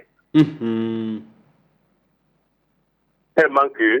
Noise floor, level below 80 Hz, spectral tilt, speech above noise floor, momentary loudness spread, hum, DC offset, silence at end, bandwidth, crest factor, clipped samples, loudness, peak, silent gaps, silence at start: -67 dBFS; -68 dBFS; -8 dB/octave; 49 dB; 11 LU; none; under 0.1%; 0 s; 7 kHz; 18 dB; under 0.1%; -20 LUFS; -4 dBFS; none; 0.35 s